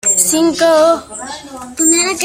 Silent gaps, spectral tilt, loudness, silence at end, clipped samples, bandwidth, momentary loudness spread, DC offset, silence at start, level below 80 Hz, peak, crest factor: none; -1.5 dB/octave; -11 LUFS; 0 s; under 0.1%; 16.5 kHz; 17 LU; under 0.1%; 0.05 s; -52 dBFS; 0 dBFS; 14 dB